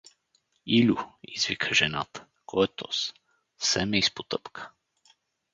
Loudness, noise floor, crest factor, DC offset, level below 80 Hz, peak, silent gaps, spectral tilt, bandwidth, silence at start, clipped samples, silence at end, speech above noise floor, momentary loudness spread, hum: -26 LUFS; -71 dBFS; 22 dB; under 0.1%; -60 dBFS; -8 dBFS; none; -3.5 dB/octave; 7.8 kHz; 0.65 s; under 0.1%; 0.85 s; 45 dB; 19 LU; none